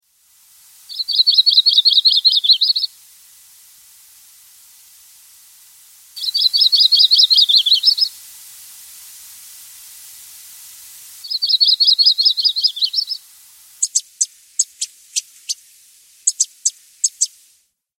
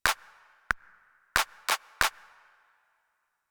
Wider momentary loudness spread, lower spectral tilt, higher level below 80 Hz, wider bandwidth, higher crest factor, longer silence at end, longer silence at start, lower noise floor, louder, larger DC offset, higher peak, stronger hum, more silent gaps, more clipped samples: first, 15 LU vs 6 LU; second, 7 dB/octave vs 0 dB/octave; second, -76 dBFS vs -54 dBFS; second, 17 kHz vs over 20 kHz; second, 18 dB vs 30 dB; second, 0.7 s vs 1.4 s; first, 0.9 s vs 0.05 s; second, -59 dBFS vs -77 dBFS; first, -13 LUFS vs -30 LUFS; neither; first, 0 dBFS vs -4 dBFS; neither; neither; neither